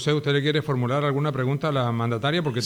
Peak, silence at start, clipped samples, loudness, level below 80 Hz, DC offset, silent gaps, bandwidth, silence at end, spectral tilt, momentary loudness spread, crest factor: -10 dBFS; 0 s; under 0.1%; -24 LUFS; -60 dBFS; under 0.1%; none; 12 kHz; 0 s; -6.5 dB/octave; 3 LU; 14 dB